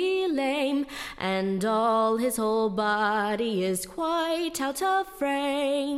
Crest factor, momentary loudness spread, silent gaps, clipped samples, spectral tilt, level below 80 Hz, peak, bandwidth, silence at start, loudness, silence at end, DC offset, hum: 14 dB; 5 LU; none; under 0.1%; -4 dB/octave; -60 dBFS; -14 dBFS; 16.5 kHz; 0 s; -26 LUFS; 0 s; under 0.1%; none